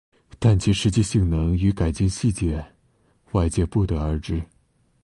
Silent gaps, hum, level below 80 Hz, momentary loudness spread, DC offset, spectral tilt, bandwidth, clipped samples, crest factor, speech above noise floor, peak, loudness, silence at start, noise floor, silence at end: none; none; -32 dBFS; 8 LU; under 0.1%; -6.5 dB/octave; 11.5 kHz; under 0.1%; 16 dB; 42 dB; -6 dBFS; -23 LUFS; 0.4 s; -63 dBFS; 0.6 s